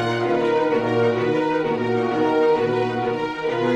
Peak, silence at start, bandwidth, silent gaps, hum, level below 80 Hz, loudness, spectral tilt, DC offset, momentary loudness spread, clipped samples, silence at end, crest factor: -8 dBFS; 0 s; 8.6 kHz; none; none; -56 dBFS; -21 LUFS; -7 dB/octave; under 0.1%; 5 LU; under 0.1%; 0 s; 12 dB